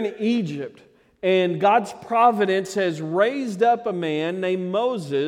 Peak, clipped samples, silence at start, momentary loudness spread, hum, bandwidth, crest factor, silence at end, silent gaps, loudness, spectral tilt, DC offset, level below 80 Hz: -6 dBFS; under 0.1%; 0 s; 7 LU; none; 14 kHz; 16 dB; 0 s; none; -22 LUFS; -6 dB/octave; under 0.1%; -72 dBFS